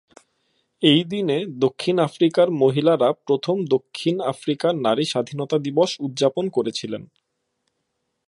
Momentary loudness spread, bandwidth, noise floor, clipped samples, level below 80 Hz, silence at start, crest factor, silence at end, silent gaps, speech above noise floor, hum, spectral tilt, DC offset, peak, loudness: 7 LU; 11.5 kHz; -75 dBFS; under 0.1%; -70 dBFS; 0.8 s; 18 dB; 1.2 s; none; 55 dB; none; -6 dB/octave; under 0.1%; -2 dBFS; -21 LUFS